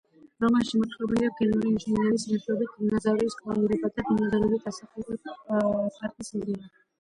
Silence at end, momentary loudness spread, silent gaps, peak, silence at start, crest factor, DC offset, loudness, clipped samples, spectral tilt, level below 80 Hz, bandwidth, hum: 0.35 s; 12 LU; none; -12 dBFS; 0.4 s; 14 dB; under 0.1%; -27 LUFS; under 0.1%; -6.5 dB/octave; -56 dBFS; 11 kHz; none